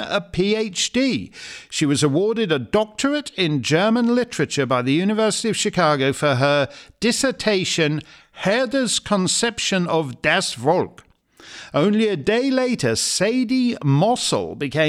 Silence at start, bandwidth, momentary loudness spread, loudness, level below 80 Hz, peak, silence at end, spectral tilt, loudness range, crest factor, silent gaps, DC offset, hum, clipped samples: 0 s; 14.5 kHz; 6 LU; -20 LUFS; -54 dBFS; -4 dBFS; 0 s; -4 dB/octave; 2 LU; 16 dB; none; under 0.1%; none; under 0.1%